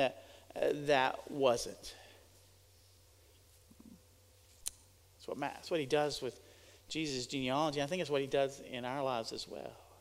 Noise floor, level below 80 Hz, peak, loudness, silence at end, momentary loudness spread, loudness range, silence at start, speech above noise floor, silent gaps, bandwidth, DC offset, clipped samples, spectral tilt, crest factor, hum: -64 dBFS; -68 dBFS; -16 dBFS; -36 LUFS; 0.05 s; 17 LU; 16 LU; 0 s; 28 dB; none; 16 kHz; under 0.1%; under 0.1%; -4 dB/octave; 22 dB; none